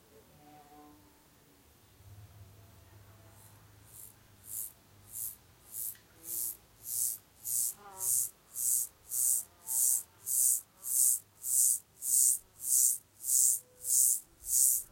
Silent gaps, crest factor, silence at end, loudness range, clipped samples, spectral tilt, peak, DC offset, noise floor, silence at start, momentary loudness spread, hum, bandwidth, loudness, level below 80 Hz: none; 22 dB; 0.05 s; 18 LU; under 0.1%; 1 dB/octave; -12 dBFS; under 0.1%; -63 dBFS; 0.8 s; 15 LU; none; 16.5 kHz; -29 LUFS; -72 dBFS